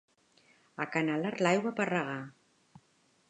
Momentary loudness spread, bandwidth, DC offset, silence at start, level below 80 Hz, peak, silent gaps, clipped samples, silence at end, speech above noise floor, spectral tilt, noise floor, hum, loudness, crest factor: 15 LU; 11 kHz; under 0.1%; 0.8 s; -84 dBFS; -12 dBFS; none; under 0.1%; 1 s; 38 dB; -5.5 dB/octave; -70 dBFS; none; -32 LUFS; 22 dB